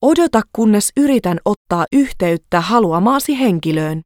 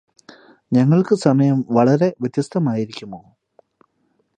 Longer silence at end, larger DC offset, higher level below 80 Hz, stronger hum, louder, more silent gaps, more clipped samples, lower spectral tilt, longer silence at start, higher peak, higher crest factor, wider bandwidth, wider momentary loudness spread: second, 0.05 s vs 1.2 s; neither; first, -44 dBFS vs -64 dBFS; neither; first, -15 LUFS vs -18 LUFS; first, 1.57-1.65 s vs none; neither; second, -5.5 dB/octave vs -8 dB/octave; second, 0 s vs 0.7 s; about the same, 0 dBFS vs 0 dBFS; about the same, 14 dB vs 18 dB; first, 17.5 kHz vs 9.6 kHz; second, 5 LU vs 15 LU